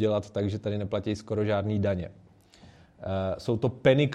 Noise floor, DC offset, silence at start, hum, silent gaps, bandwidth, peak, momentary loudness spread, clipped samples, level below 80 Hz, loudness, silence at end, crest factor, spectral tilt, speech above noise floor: -55 dBFS; under 0.1%; 0 s; none; none; 9.6 kHz; -8 dBFS; 10 LU; under 0.1%; -58 dBFS; -29 LUFS; 0 s; 20 dB; -7.5 dB/octave; 27 dB